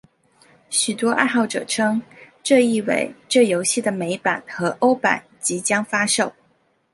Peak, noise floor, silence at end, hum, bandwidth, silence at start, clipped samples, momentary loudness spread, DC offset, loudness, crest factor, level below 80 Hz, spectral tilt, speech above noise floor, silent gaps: 0 dBFS; -63 dBFS; 0.6 s; none; 11.5 kHz; 0.7 s; under 0.1%; 7 LU; under 0.1%; -20 LUFS; 20 dB; -68 dBFS; -3 dB/octave; 43 dB; none